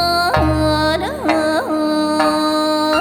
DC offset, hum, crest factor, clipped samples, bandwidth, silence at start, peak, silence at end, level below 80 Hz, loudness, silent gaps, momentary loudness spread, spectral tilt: under 0.1%; none; 16 dB; under 0.1%; 18 kHz; 0 s; 0 dBFS; 0 s; -32 dBFS; -16 LUFS; none; 3 LU; -5 dB/octave